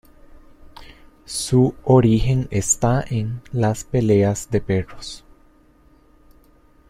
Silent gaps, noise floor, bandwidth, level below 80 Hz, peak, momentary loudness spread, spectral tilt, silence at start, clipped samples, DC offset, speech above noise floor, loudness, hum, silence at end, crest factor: none; -53 dBFS; 15 kHz; -38 dBFS; -4 dBFS; 13 LU; -6 dB/octave; 0.35 s; under 0.1%; under 0.1%; 34 dB; -19 LUFS; none; 1.7 s; 18 dB